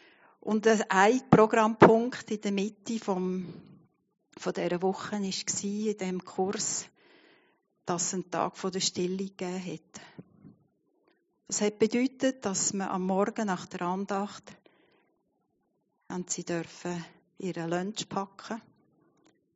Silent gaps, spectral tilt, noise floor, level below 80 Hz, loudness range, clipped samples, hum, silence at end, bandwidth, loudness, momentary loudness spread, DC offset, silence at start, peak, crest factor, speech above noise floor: none; -4.5 dB/octave; -76 dBFS; -72 dBFS; 12 LU; under 0.1%; none; 0.95 s; 8 kHz; -29 LUFS; 17 LU; under 0.1%; 0.45 s; -2 dBFS; 30 dB; 47 dB